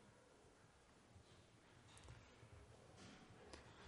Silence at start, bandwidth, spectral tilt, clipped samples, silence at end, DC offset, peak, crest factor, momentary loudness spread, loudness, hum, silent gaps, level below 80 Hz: 0 s; 11.5 kHz; -4.5 dB/octave; under 0.1%; 0 s; under 0.1%; -38 dBFS; 28 dB; 7 LU; -65 LUFS; none; none; -74 dBFS